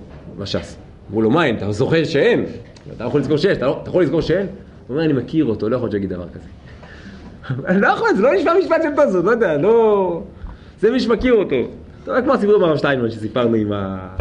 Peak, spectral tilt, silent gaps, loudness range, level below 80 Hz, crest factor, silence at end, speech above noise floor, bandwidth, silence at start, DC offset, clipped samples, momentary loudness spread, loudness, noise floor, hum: -2 dBFS; -7 dB/octave; none; 5 LU; -42 dBFS; 14 dB; 0 s; 20 dB; 9.4 kHz; 0 s; under 0.1%; under 0.1%; 20 LU; -17 LUFS; -37 dBFS; none